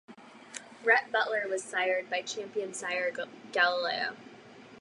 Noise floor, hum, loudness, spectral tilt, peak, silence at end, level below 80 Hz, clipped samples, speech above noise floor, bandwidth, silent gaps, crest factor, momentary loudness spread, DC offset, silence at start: -52 dBFS; none; -30 LUFS; -1.5 dB/octave; -10 dBFS; 0 s; -84 dBFS; under 0.1%; 21 dB; 11.5 kHz; none; 22 dB; 19 LU; under 0.1%; 0.1 s